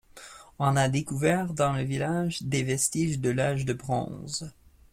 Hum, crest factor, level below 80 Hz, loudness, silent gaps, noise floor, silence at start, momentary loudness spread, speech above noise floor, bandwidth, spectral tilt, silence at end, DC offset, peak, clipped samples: none; 18 dB; -54 dBFS; -28 LUFS; none; -49 dBFS; 0.15 s; 10 LU; 22 dB; 16 kHz; -5 dB/octave; 0.4 s; under 0.1%; -10 dBFS; under 0.1%